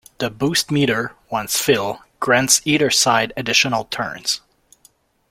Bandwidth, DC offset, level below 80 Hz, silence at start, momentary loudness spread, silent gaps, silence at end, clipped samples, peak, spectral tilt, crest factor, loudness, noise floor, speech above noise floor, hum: 16.5 kHz; under 0.1%; -54 dBFS; 0.2 s; 11 LU; none; 0.95 s; under 0.1%; 0 dBFS; -2.5 dB/octave; 20 dB; -18 LUFS; -56 dBFS; 37 dB; none